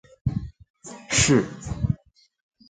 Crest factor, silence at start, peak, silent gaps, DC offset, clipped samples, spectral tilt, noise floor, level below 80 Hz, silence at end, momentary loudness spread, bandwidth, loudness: 20 dB; 0.25 s; -6 dBFS; 0.70-0.74 s; under 0.1%; under 0.1%; -4 dB/octave; -46 dBFS; -40 dBFS; 0.75 s; 24 LU; 9.6 kHz; -24 LUFS